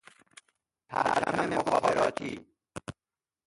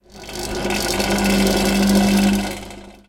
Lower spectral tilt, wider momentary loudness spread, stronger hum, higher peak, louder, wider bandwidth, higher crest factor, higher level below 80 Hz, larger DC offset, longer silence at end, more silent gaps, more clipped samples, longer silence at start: about the same, -4.5 dB/octave vs -4.5 dB/octave; first, 18 LU vs 15 LU; second, none vs 50 Hz at -25 dBFS; second, -12 dBFS vs -4 dBFS; second, -29 LUFS vs -18 LUFS; second, 11.5 kHz vs 17 kHz; about the same, 20 dB vs 16 dB; second, -62 dBFS vs -34 dBFS; neither; first, 0.55 s vs 0.15 s; neither; neither; first, 0.9 s vs 0.15 s